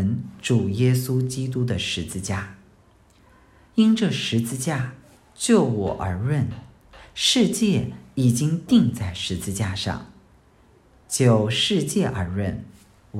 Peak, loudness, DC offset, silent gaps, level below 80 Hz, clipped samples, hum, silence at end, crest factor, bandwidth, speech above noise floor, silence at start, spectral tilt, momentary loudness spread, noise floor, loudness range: -6 dBFS; -22 LUFS; under 0.1%; none; -52 dBFS; under 0.1%; none; 0 s; 18 dB; 15.5 kHz; 34 dB; 0 s; -5 dB/octave; 10 LU; -55 dBFS; 3 LU